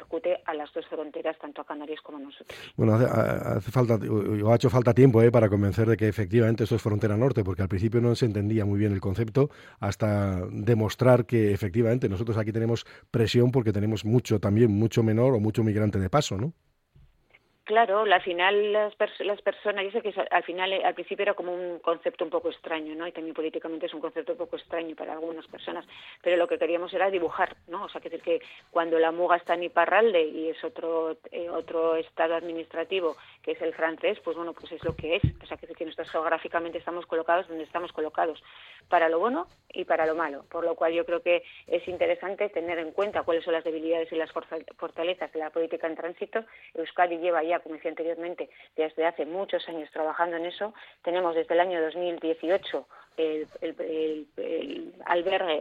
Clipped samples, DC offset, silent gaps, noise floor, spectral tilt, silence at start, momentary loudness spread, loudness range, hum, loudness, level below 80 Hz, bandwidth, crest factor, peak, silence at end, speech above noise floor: under 0.1%; under 0.1%; none; -63 dBFS; -7 dB/octave; 0 s; 13 LU; 8 LU; none; -27 LUFS; -56 dBFS; 15 kHz; 20 dB; -6 dBFS; 0 s; 36 dB